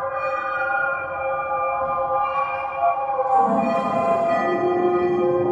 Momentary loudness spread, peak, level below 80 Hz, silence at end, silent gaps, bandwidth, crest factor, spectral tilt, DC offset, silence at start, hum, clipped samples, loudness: 5 LU; -8 dBFS; -58 dBFS; 0 s; none; 8.4 kHz; 14 dB; -7.5 dB/octave; under 0.1%; 0 s; none; under 0.1%; -21 LUFS